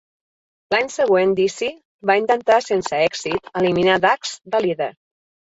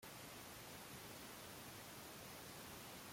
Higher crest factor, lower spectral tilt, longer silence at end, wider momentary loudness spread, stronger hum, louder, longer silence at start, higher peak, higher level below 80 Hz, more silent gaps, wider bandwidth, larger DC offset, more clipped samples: about the same, 16 dB vs 14 dB; first, -4.5 dB/octave vs -3 dB/octave; first, 0.6 s vs 0 s; first, 9 LU vs 1 LU; neither; first, -19 LUFS vs -54 LUFS; first, 0.7 s vs 0 s; first, -4 dBFS vs -42 dBFS; first, -58 dBFS vs -76 dBFS; first, 1.85-1.99 s vs none; second, 8 kHz vs 16.5 kHz; neither; neither